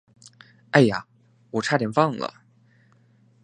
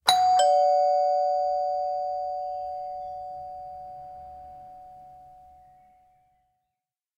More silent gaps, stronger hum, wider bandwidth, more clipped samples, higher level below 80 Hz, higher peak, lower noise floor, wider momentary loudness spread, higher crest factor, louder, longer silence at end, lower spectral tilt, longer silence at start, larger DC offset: neither; neither; second, 10 kHz vs 15 kHz; neither; about the same, -64 dBFS vs -66 dBFS; about the same, 0 dBFS vs -2 dBFS; second, -59 dBFS vs -87 dBFS; second, 14 LU vs 24 LU; about the same, 24 dB vs 26 dB; about the same, -23 LUFS vs -25 LUFS; second, 1.15 s vs 1.9 s; first, -6 dB/octave vs 0 dB/octave; first, 0.75 s vs 0.05 s; neither